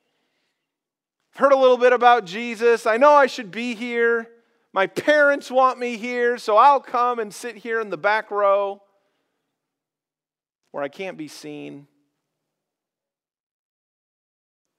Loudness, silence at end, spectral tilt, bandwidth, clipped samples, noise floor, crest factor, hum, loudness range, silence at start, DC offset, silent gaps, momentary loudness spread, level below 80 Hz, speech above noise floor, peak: -19 LUFS; 3 s; -3.5 dB/octave; 13.5 kHz; under 0.1%; under -90 dBFS; 20 dB; none; 19 LU; 1.35 s; under 0.1%; 10.55-10.59 s; 18 LU; -90 dBFS; over 71 dB; -2 dBFS